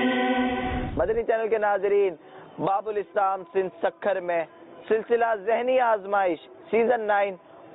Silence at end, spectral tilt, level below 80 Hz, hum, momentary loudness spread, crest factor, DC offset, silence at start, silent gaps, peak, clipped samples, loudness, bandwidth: 0 s; -10 dB/octave; -48 dBFS; none; 7 LU; 14 dB; under 0.1%; 0 s; none; -12 dBFS; under 0.1%; -25 LUFS; 4 kHz